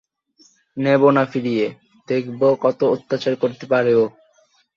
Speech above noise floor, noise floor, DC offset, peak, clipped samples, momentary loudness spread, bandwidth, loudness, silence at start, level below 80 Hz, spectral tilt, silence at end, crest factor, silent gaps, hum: 41 dB; -59 dBFS; under 0.1%; -2 dBFS; under 0.1%; 9 LU; 7.2 kHz; -19 LUFS; 0.75 s; -64 dBFS; -7.5 dB/octave; 0.65 s; 18 dB; none; none